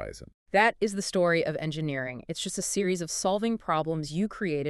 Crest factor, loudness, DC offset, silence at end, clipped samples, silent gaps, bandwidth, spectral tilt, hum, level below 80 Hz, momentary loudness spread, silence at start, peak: 20 dB; -28 LUFS; under 0.1%; 0 s; under 0.1%; 0.34-0.46 s; 13.5 kHz; -4 dB/octave; none; -58 dBFS; 10 LU; 0 s; -8 dBFS